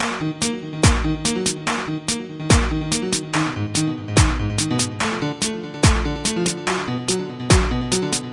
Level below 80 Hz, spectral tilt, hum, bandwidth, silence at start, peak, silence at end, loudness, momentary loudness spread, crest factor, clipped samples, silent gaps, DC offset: -30 dBFS; -4 dB/octave; none; 11.5 kHz; 0 s; 0 dBFS; 0 s; -21 LUFS; 6 LU; 20 dB; under 0.1%; none; under 0.1%